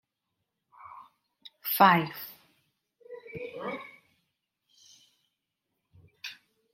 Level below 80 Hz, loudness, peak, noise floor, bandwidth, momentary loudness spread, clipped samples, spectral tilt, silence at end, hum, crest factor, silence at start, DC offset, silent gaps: -78 dBFS; -27 LUFS; -8 dBFS; -83 dBFS; 16.5 kHz; 28 LU; under 0.1%; -4.5 dB/octave; 0.4 s; none; 26 dB; 0.85 s; under 0.1%; none